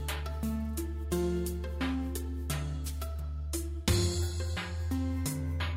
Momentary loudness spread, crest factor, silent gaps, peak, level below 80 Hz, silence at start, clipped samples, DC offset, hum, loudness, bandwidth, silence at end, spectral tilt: 7 LU; 16 dB; none; -16 dBFS; -38 dBFS; 0 s; under 0.1%; under 0.1%; none; -34 LUFS; 16 kHz; 0 s; -5 dB/octave